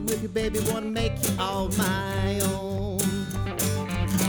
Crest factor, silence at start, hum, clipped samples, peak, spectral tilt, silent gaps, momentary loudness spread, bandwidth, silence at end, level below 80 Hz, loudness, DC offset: 18 dB; 0 s; none; under 0.1%; -8 dBFS; -4.5 dB/octave; none; 3 LU; over 20 kHz; 0 s; -38 dBFS; -27 LUFS; under 0.1%